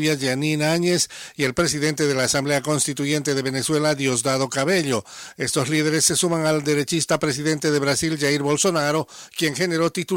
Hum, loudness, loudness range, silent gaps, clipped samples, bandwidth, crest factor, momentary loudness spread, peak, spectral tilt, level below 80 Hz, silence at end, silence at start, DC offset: none; -21 LUFS; 1 LU; none; under 0.1%; 16.5 kHz; 14 dB; 5 LU; -6 dBFS; -3.5 dB/octave; -56 dBFS; 0 s; 0 s; under 0.1%